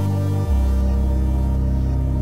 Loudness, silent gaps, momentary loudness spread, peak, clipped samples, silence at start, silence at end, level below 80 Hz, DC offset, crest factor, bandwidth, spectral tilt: -21 LUFS; none; 1 LU; -10 dBFS; under 0.1%; 0 s; 0 s; -20 dBFS; under 0.1%; 10 dB; 7.6 kHz; -9 dB/octave